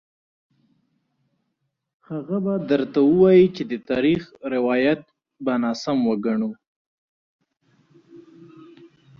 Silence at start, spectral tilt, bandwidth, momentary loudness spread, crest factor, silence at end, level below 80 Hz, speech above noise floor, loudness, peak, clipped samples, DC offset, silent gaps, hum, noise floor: 2.1 s; -7.5 dB/octave; 7 kHz; 14 LU; 18 dB; 1 s; -62 dBFS; 56 dB; -21 LUFS; -4 dBFS; under 0.1%; under 0.1%; 6.67-7.39 s; none; -76 dBFS